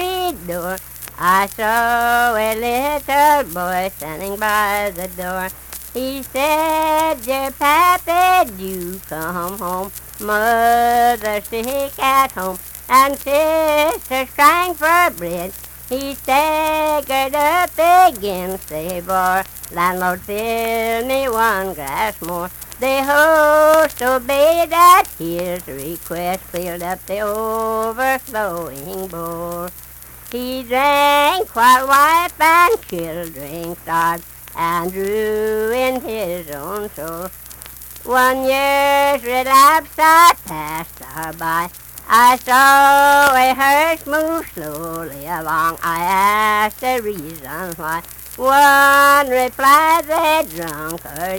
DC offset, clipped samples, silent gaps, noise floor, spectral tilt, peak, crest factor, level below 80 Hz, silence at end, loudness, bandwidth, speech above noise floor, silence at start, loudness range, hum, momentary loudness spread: under 0.1%; under 0.1%; none; -35 dBFS; -3 dB/octave; 0 dBFS; 16 dB; -44 dBFS; 0 s; -15 LUFS; 19.5 kHz; 19 dB; 0 s; 7 LU; none; 16 LU